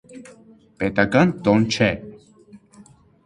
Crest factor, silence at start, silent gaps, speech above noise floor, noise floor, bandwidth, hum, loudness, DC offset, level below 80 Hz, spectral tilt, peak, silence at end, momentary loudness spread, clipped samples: 22 dB; 0.1 s; none; 31 dB; -50 dBFS; 11 kHz; none; -19 LUFS; under 0.1%; -50 dBFS; -6 dB/octave; -2 dBFS; 0.7 s; 9 LU; under 0.1%